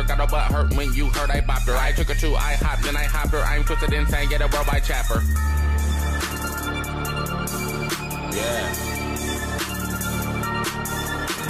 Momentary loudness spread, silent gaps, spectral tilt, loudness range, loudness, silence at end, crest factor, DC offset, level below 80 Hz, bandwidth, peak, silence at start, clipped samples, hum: 4 LU; none; -4.5 dB/octave; 3 LU; -24 LUFS; 0 s; 12 dB; under 0.1%; -24 dBFS; 15.5 kHz; -10 dBFS; 0 s; under 0.1%; none